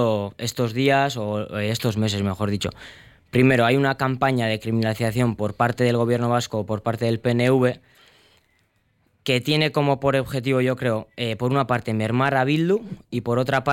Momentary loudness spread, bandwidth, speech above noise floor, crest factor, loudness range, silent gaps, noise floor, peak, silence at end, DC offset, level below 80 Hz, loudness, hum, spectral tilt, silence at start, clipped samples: 7 LU; 16.5 kHz; 44 dB; 16 dB; 3 LU; none; -65 dBFS; -6 dBFS; 0 s; under 0.1%; -54 dBFS; -22 LUFS; none; -6 dB/octave; 0 s; under 0.1%